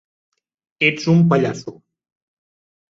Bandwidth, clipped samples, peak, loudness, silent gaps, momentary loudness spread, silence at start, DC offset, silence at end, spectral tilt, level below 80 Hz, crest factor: 7.6 kHz; under 0.1%; -2 dBFS; -17 LUFS; none; 17 LU; 0.8 s; under 0.1%; 1.15 s; -6.5 dB/octave; -60 dBFS; 18 dB